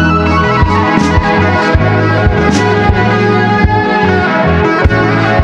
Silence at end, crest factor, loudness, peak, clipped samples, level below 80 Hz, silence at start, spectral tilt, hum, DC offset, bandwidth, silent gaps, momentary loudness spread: 0 s; 8 dB; -10 LUFS; 0 dBFS; under 0.1%; -20 dBFS; 0 s; -7 dB/octave; none; under 0.1%; 9.6 kHz; none; 0 LU